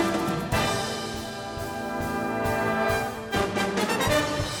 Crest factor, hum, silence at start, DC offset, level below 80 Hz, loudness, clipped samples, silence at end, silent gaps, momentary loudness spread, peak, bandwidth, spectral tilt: 16 dB; none; 0 s; under 0.1%; -44 dBFS; -27 LUFS; under 0.1%; 0 s; none; 9 LU; -10 dBFS; 19 kHz; -4.5 dB/octave